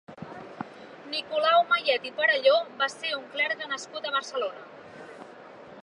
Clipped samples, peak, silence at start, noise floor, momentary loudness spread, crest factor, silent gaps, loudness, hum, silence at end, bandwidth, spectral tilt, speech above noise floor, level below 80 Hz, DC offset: under 0.1%; -10 dBFS; 0.1 s; -47 dBFS; 23 LU; 20 dB; none; -26 LUFS; none; 0 s; 11 kHz; -2 dB/octave; 20 dB; -78 dBFS; under 0.1%